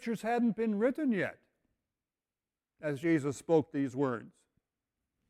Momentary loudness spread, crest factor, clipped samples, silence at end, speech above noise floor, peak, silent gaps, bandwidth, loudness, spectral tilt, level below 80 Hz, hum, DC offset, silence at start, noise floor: 8 LU; 20 dB; under 0.1%; 1 s; over 58 dB; -14 dBFS; none; 14 kHz; -32 LUFS; -7 dB/octave; -74 dBFS; none; under 0.1%; 0 s; under -90 dBFS